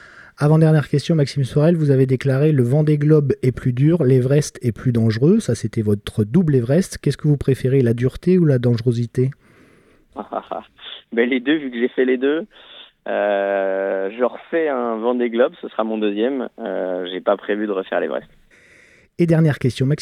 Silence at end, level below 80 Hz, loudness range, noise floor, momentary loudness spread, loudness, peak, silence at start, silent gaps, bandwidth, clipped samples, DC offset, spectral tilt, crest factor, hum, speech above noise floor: 0 s; -48 dBFS; 6 LU; -53 dBFS; 10 LU; -19 LUFS; -2 dBFS; 0.15 s; none; 12 kHz; under 0.1%; under 0.1%; -7.5 dB/octave; 16 dB; none; 35 dB